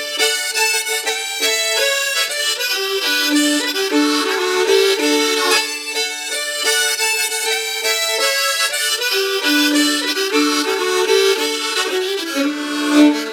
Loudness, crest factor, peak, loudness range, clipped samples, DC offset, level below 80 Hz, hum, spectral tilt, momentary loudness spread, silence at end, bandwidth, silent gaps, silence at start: -16 LUFS; 16 dB; -2 dBFS; 1 LU; under 0.1%; under 0.1%; -70 dBFS; none; 0.5 dB/octave; 6 LU; 0 s; 19.5 kHz; none; 0 s